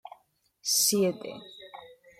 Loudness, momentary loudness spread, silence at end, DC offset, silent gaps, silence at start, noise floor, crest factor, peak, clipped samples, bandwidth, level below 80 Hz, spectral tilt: -25 LUFS; 23 LU; 0.25 s; under 0.1%; none; 0.05 s; -67 dBFS; 20 dB; -12 dBFS; under 0.1%; 16.5 kHz; -76 dBFS; -2.5 dB/octave